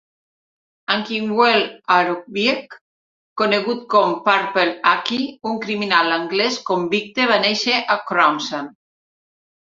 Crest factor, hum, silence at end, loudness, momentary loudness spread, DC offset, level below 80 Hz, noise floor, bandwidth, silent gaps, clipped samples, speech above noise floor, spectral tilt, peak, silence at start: 20 dB; none; 1.05 s; -18 LUFS; 8 LU; under 0.1%; -68 dBFS; under -90 dBFS; 7.8 kHz; 2.81-3.36 s; under 0.1%; over 71 dB; -3.5 dB/octave; 0 dBFS; 0.9 s